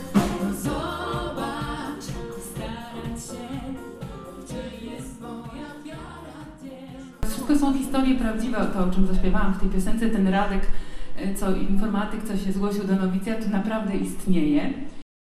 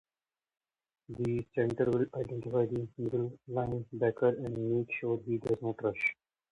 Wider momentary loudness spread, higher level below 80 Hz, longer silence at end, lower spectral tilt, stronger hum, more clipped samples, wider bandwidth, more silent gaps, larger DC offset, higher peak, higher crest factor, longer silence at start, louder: first, 16 LU vs 6 LU; first, -32 dBFS vs -64 dBFS; second, 0.25 s vs 0.4 s; second, -6 dB/octave vs -9 dB/octave; neither; neither; first, 13.5 kHz vs 9.4 kHz; neither; neither; first, -6 dBFS vs -16 dBFS; about the same, 16 dB vs 18 dB; second, 0 s vs 1.1 s; first, -27 LUFS vs -33 LUFS